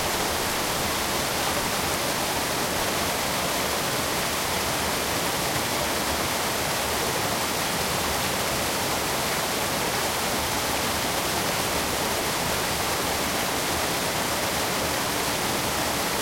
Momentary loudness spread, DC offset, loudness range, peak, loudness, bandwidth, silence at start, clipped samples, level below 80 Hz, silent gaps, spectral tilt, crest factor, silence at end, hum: 0 LU; under 0.1%; 0 LU; -12 dBFS; -24 LUFS; 16.5 kHz; 0 s; under 0.1%; -46 dBFS; none; -2 dB/octave; 14 dB; 0 s; none